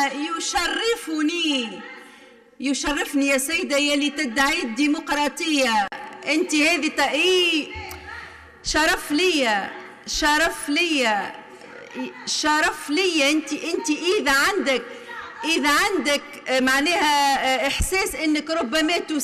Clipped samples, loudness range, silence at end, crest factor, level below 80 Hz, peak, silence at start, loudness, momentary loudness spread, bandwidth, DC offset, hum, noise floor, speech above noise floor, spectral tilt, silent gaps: under 0.1%; 2 LU; 0 s; 14 dB; -44 dBFS; -10 dBFS; 0 s; -21 LUFS; 15 LU; 14.5 kHz; under 0.1%; none; -49 dBFS; 27 dB; -2 dB/octave; none